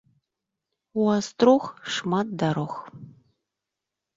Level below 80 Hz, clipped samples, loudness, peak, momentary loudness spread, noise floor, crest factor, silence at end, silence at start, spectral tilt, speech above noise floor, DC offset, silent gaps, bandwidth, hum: -68 dBFS; under 0.1%; -24 LUFS; -4 dBFS; 14 LU; -86 dBFS; 22 dB; 1.05 s; 0.95 s; -6 dB/octave; 62 dB; under 0.1%; none; 7.8 kHz; none